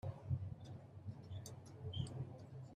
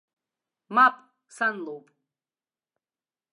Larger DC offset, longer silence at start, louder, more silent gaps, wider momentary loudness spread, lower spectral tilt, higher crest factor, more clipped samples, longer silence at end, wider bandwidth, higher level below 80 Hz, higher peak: neither; second, 0.05 s vs 0.7 s; second, -49 LUFS vs -23 LUFS; neither; second, 9 LU vs 19 LU; first, -6.5 dB/octave vs -3.5 dB/octave; about the same, 18 dB vs 22 dB; neither; second, 0 s vs 1.55 s; first, 13 kHz vs 11 kHz; first, -68 dBFS vs under -90 dBFS; second, -30 dBFS vs -8 dBFS